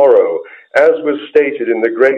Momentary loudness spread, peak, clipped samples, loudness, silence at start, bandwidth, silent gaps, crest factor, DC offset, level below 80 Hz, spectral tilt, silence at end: 7 LU; 0 dBFS; under 0.1%; -13 LUFS; 0 s; 8.2 kHz; none; 12 dB; under 0.1%; -64 dBFS; -5.5 dB/octave; 0 s